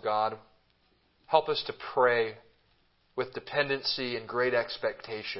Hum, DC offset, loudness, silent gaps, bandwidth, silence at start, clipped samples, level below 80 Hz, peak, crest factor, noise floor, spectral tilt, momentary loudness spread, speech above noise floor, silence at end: none; under 0.1%; -30 LUFS; none; 5.8 kHz; 0.05 s; under 0.1%; -70 dBFS; -8 dBFS; 22 dB; -69 dBFS; -7.5 dB/octave; 10 LU; 39 dB; 0 s